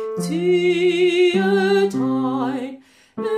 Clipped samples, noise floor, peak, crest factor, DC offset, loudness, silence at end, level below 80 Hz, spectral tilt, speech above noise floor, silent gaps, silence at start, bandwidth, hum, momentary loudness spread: under 0.1%; -40 dBFS; -8 dBFS; 12 dB; under 0.1%; -19 LUFS; 0 s; -68 dBFS; -6 dB/octave; 23 dB; none; 0 s; 13 kHz; none; 13 LU